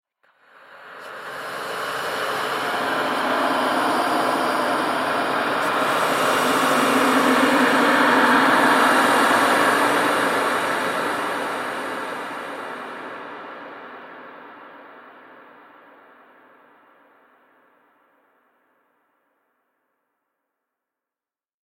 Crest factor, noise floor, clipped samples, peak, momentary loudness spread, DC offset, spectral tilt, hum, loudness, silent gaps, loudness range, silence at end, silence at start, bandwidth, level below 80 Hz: 18 dB; under -90 dBFS; under 0.1%; -4 dBFS; 20 LU; under 0.1%; -3 dB/octave; none; -19 LUFS; none; 18 LU; 6.35 s; 0.7 s; 16.5 kHz; -70 dBFS